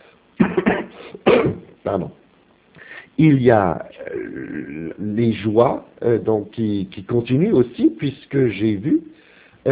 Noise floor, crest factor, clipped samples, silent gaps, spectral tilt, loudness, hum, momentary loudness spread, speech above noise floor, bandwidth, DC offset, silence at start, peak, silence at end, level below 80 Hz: -55 dBFS; 20 dB; under 0.1%; none; -12 dB/octave; -20 LUFS; none; 14 LU; 36 dB; 4 kHz; under 0.1%; 0.4 s; 0 dBFS; 0 s; -48 dBFS